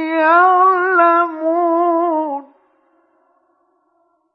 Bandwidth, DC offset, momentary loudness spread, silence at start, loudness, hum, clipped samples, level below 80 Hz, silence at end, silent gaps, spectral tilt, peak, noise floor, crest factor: 5.4 kHz; under 0.1%; 9 LU; 0 s; -14 LUFS; none; under 0.1%; -90 dBFS; 1.9 s; none; -5.5 dB/octave; -2 dBFS; -62 dBFS; 16 dB